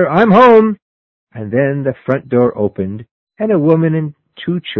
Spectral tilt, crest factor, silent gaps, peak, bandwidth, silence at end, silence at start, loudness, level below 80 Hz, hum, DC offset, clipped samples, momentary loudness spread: -9.5 dB/octave; 14 dB; 0.82-1.27 s, 3.11-3.27 s; 0 dBFS; 6.4 kHz; 0 s; 0 s; -13 LUFS; -50 dBFS; none; under 0.1%; 0.2%; 19 LU